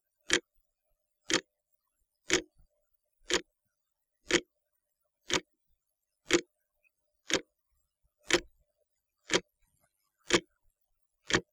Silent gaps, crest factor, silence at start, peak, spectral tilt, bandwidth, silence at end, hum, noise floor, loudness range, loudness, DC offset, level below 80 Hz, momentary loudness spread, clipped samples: none; 30 dB; 0.3 s; -8 dBFS; -2 dB/octave; 16.5 kHz; 0.1 s; none; -85 dBFS; 1 LU; -32 LUFS; under 0.1%; -62 dBFS; 3 LU; under 0.1%